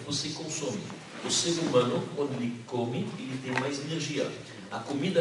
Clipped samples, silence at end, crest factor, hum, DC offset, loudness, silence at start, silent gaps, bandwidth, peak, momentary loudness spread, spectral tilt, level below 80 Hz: under 0.1%; 0 s; 20 dB; none; under 0.1%; -31 LUFS; 0 s; none; 11.5 kHz; -10 dBFS; 12 LU; -4 dB/octave; -70 dBFS